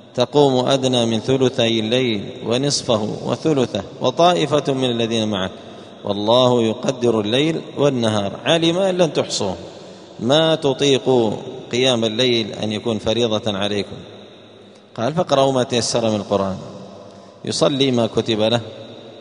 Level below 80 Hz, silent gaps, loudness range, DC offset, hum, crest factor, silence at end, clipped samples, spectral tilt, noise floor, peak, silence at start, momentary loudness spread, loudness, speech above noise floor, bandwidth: -56 dBFS; none; 3 LU; under 0.1%; none; 18 dB; 0 s; under 0.1%; -5 dB/octave; -44 dBFS; 0 dBFS; 0.15 s; 15 LU; -18 LUFS; 26 dB; 10.5 kHz